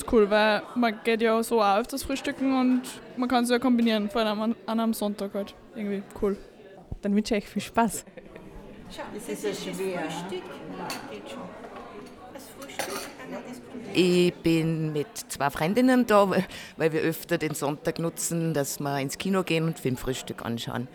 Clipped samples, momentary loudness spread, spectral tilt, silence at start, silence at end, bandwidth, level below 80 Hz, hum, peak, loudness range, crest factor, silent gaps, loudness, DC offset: under 0.1%; 18 LU; -5 dB/octave; 0 s; 0.05 s; 19.5 kHz; -52 dBFS; none; -6 dBFS; 10 LU; 20 dB; none; -27 LUFS; under 0.1%